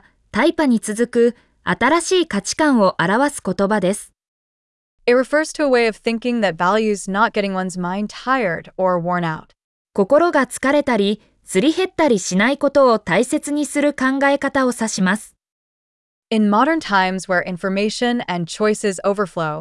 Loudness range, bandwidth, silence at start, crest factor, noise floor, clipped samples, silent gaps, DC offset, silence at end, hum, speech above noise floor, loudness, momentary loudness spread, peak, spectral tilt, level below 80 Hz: 3 LU; 12 kHz; 0.35 s; 14 dB; under -90 dBFS; under 0.1%; 4.28-4.98 s, 9.64-9.85 s, 15.52-16.23 s; under 0.1%; 0 s; none; over 72 dB; -18 LUFS; 8 LU; -4 dBFS; -4.5 dB/octave; -54 dBFS